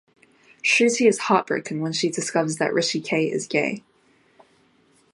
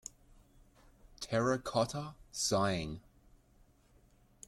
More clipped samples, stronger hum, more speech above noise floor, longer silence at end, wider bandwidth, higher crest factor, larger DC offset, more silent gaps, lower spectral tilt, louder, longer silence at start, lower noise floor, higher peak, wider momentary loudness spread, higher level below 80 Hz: neither; neither; first, 38 dB vs 32 dB; second, 1.35 s vs 1.5 s; second, 11.5 kHz vs 16 kHz; about the same, 20 dB vs 20 dB; neither; neither; about the same, -3.5 dB/octave vs -4 dB/octave; first, -22 LUFS vs -35 LUFS; second, 0.65 s vs 1.05 s; second, -60 dBFS vs -66 dBFS; first, -4 dBFS vs -18 dBFS; second, 8 LU vs 16 LU; second, -74 dBFS vs -60 dBFS